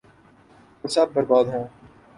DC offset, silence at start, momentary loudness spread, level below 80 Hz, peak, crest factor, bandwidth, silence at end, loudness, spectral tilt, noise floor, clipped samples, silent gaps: under 0.1%; 0.85 s; 17 LU; -62 dBFS; -6 dBFS; 18 dB; 11.5 kHz; 0.5 s; -22 LUFS; -5 dB/octave; -53 dBFS; under 0.1%; none